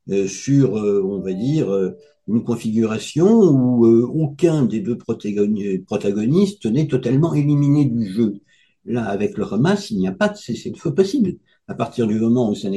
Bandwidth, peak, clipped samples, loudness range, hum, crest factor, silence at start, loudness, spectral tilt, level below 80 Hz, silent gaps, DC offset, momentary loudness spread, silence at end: 11.5 kHz; -2 dBFS; under 0.1%; 4 LU; none; 16 dB; 0.05 s; -19 LUFS; -7.5 dB/octave; -54 dBFS; none; under 0.1%; 10 LU; 0 s